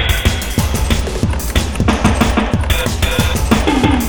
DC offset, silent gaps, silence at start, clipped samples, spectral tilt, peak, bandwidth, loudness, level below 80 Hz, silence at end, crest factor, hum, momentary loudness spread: 2%; none; 0 s; under 0.1%; -5 dB/octave; 0 dBFS; over 20 kHz; -15 LUFS; -20 dBFS; 0 s; 14 dB; none; 4 LU